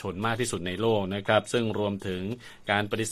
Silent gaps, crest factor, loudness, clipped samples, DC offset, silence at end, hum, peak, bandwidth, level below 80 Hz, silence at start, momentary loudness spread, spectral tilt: none; 20 dB; -28 LUFS; under 0.1%; under 0.1%; 0 s; none; -8 dBFS; 14.5 kHz; -58 dBFS; 0 s; 8 LU; -4.5 dB/octave